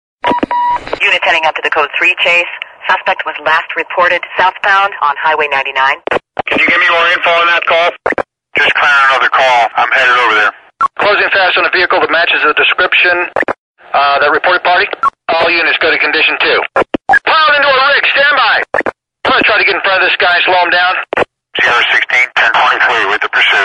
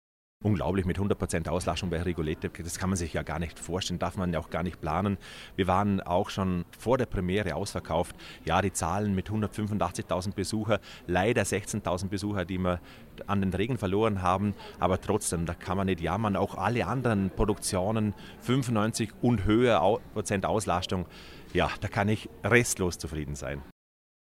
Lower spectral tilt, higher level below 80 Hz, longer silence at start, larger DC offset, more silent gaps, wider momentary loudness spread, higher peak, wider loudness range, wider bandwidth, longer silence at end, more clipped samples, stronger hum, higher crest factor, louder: second, -2.5 dB/octave vs -5.5 dB/octave; about the same, -48 dBFS vs -46 dBFS; second, 0.25 s vs 0.4 s; neither; first, 13.58-13.75 s vs none; about the same, 8 LU vs 8 LU; first, 0 dBFS vs -6 dBFS; about the same, 2 LU vs 3 LU; second, 11 kHz vs 16 kHz; second, 0 s vs 0.6 s; neither; neither; second, 10 dB vs 22 dB; first, -9 LUFS vs -29 LUFS